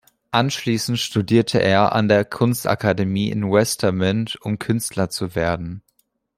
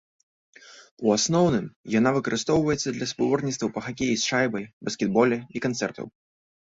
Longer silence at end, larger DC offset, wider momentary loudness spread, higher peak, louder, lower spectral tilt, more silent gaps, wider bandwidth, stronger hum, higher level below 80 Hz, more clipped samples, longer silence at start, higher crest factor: about the same, 0.6 s vs 0.55 s; neither; about the same, 7 LU vs 8 LU; first, -2 dBFS vs -6 dBFS; first, -20 LUFS vs -25 LUFS; about the same, -5 dB/octave vs -4.5 dB/octave; second, none vs 0.91-0.97 s, 1.76-1.84 s, 4.73-4.81 s; first, 16 kHz vs 8 kHz; neither; first, -52 dBFS vs -58 dBFS; neither; second, 0.3 s vs 0.65 s; about the same, 18 dB vs 20 dB